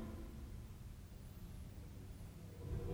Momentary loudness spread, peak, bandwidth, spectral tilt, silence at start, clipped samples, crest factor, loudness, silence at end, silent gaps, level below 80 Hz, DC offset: 6 LU; -32 dBFS; over 20 kHz; -7 dB/octave; 0 s; under 0.1%; 18 dB; -53 LUFS; 0 s; none; -54 dBFS; under 0.1%